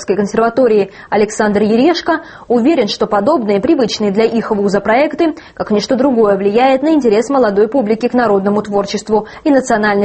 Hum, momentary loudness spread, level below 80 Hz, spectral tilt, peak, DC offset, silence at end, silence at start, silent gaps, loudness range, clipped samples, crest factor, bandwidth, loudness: none; 6 LU; -48 dBFS; -5.5 dB/octave; 0 dBFS; under 0.1%; 0 s; 0 s; none; 1 LU; under 0.1%; 12 dB; 8.8 kHz; -13 LUFS